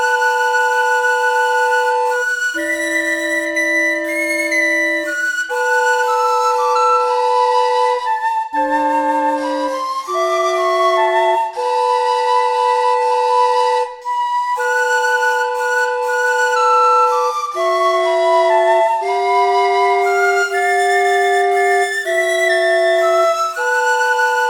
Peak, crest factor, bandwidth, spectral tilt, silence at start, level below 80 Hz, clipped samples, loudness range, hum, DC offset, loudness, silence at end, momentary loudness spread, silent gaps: -4 dBFS; 12 dB; 19 kHz; -0.5 dB/octave; 0 s; -60 dBFS; under 0.1%; 2 LU; none; under 0.1%; -15 LUFS; 0 s; 4 LU; none